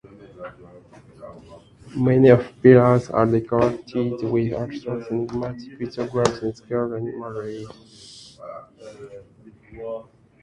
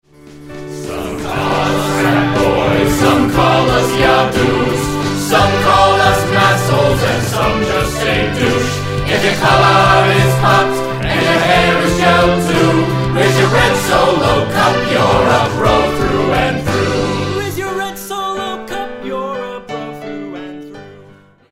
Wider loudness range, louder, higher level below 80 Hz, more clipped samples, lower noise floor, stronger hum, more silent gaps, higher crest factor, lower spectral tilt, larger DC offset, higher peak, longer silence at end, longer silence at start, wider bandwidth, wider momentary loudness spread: first, 14 LU vs 8 LU; second, -21 LUFS vs -13 LUFS; second, -52 dBFS vs -32 dBFS; neither; first, -50 dBFS vs -43 dBFS; neither; neither; first, 22 dB vs 14 dB; first, -8 dB/octave vs -5 dB/octave; neither; about the same, 0 dBFS vs 0 dBFS; about the same, 0.4 s vs 0.5 s; about the same, 0.2 s vs 0.25 s; second, 10.5 kHz vs 16.5 kHz; first, 26 LU vs 13 LU